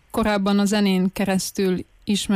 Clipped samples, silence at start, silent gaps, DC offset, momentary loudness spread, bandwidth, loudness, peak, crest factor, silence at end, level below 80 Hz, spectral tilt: under 0.1%; 0.15 s; none; under 0.1%; 5 LU; 15.5 kHz; -21 LUFS; -10 dBFS; 10 dB; 0 s; -46 dBFS; -5 dB/octave